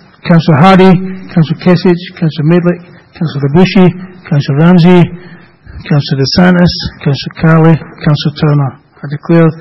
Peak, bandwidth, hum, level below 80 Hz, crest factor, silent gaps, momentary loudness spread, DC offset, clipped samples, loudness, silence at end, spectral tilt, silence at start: 0 dBFS; 6 kHz; none; -36 dBFS; 8 dB; none; 11 LU; under 0.1%; 2%; -9 LUFS; 0 s; -8.5 dB/octave; 0.25 s